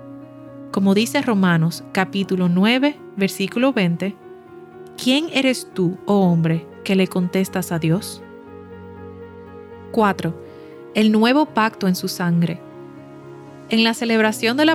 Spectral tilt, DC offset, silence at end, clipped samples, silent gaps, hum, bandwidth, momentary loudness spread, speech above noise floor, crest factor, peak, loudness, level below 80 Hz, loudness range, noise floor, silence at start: -5.5 dB/octave; under 0.1%; 0 s; under 0.1%; none; none; 15 kHz; 22 LU; 22 dB; 18 dB; -2 dBFS; -19 LUFS; -64 dBFS; 5 LU; -40 dBFS; 0 s